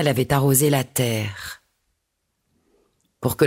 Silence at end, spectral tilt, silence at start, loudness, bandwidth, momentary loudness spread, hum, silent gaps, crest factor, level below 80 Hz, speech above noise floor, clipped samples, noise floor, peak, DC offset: 0 s; -5 dB/octave; 0 s; -20 LUFS; 16.5 kHz; 18 LU; none; none; 18 dB; -50 dBFS; 55 dB; under 0.1%; -75 dBFS; -4 dBFS; under 0.1%